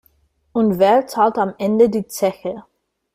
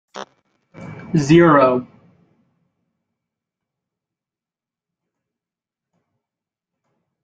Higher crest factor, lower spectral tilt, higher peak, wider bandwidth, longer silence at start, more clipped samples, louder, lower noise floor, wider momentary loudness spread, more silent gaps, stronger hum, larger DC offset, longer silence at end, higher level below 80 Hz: second, 16 dB vs 22 dB; about the same, -6 dB/octave vs -7 dB/octave; about the same, -2 dBFS vs -2 dBFS; first, 16 kHz vs 8 kHz; first, 0.55 s vs 0.15 s; neither; second, -17 LUFS vs -14 LUFS; second, -60 dBFS vs -89 dBFS; second, 13 LU vs 25 LU; neither; neither; neither; second, 0.55 s vs 5.4 s; about the same, -56 dBFS vs -56 dBFS